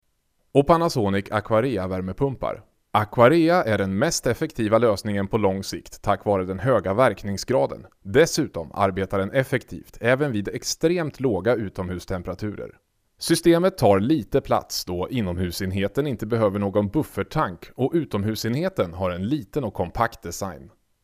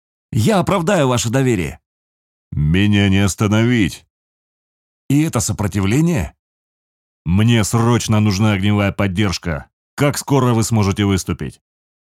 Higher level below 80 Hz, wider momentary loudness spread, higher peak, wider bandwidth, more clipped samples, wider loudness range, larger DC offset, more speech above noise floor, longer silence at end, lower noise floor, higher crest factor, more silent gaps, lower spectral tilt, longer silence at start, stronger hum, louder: second, -48 dBFS vs -38 dBFS; about the same, 11 LU vs 11 LU; about the same, -4 dBFS vs -2 dBFS; about the same, 16 kHz vs 16 kHz; neither; about the same, 4 LU vs 3 LU; neither; second, 46 dB vs over 75 dB; second, 0.35 s vs 0.6 s; second, -68 dBFS vs under -90 dBFS; about the same, 20 dB vs 16 dB; second, none vs 1.86-2.51 s, 4.10-5.09 s, 6.39-7.25 s, 9.73-9.97 s; about the same, -5.5 dB/octave vs -5.5 dB/octave; first, 0.55 s vs 0.3 s; neither; second, -23 LUFS vs -16 LUFS